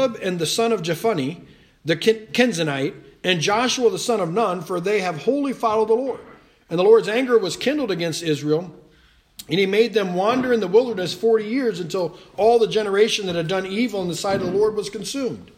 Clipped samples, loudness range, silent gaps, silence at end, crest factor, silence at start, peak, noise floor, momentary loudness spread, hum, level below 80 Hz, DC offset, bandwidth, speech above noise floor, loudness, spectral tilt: under 0.1%; 2 LU; none; 0.1 s; 18 dB; 0 s; -2 dBFS; -55 dBFS; 9 LU; none; -60 dBFS; under 0.1%; 15.5 kHz; 35 dB; -21 LUFS; -4.5 dB/octave